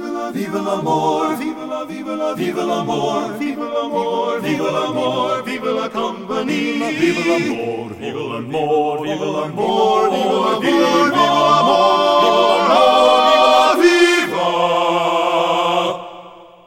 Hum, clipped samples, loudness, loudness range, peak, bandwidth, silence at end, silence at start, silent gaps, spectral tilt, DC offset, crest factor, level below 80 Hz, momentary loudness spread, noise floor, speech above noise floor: none; under 0.1%; -16 LUFS; 8 LU; -2 dBFS; 16.5 kHz; 0.2 s; 0 s; none; -4.5 dB/octave; under 0.1%; 16 dB; -60 dBFS; 12 LU; -39 dBFS; 22 dB